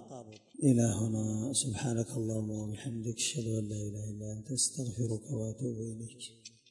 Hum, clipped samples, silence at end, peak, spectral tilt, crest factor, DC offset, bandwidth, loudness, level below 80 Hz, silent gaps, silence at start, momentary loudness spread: none; under 0.1%; 0.2 s; -14 dBFS; -5 dB/octave; 20 dB; under 0.1%; 11.5 kHz; -34 LUFS; -64 dBFS; none; 0 s; 16 LU